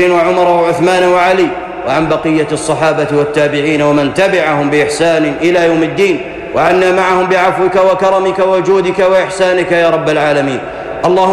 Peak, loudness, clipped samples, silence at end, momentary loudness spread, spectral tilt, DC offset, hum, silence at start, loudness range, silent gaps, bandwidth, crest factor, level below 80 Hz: -2 dBFS; -11 LUFS; under 0.1%; 0 s; 4 LU; -5.5 dB/octave; 0.2%; none; 0 s; 1 LU; none; 13 kHz; 8 dB; -42 dBFS